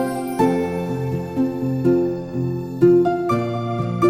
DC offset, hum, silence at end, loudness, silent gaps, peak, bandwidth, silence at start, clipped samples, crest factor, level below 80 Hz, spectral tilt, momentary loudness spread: under 0.1%; none; 0 s; -20 LUFS; none; -2 dBFS; 15.5 kHz; 0 s; under 0.1%; 16 dB; -50 dBFS; -8 dB/octave; 9 LU